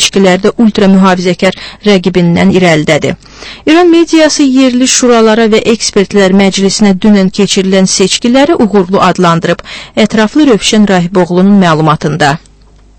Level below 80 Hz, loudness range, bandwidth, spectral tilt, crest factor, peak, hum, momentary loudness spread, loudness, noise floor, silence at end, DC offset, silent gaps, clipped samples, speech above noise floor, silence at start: -38 dBFS; 2 LU; 11 kHz; -4.5 dB/octave; 6 dB; 0 dBFS; none; 6 LU; -7 LUFS; -39 dBFS; 0.6 s; under 0.1%; none; 2%; 33 dB; 0 s